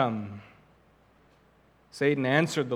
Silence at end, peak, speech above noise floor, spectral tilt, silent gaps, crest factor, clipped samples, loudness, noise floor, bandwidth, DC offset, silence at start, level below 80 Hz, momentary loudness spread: 0 s; -6 dBFS; 35 dB; -5.5 dB/octave; none; 24 dB; under 0.1%; -27 LUFS; -62 dBFS; 15.5 kHz; under 0.1%; 0 s; -70 dBFS; 22 LU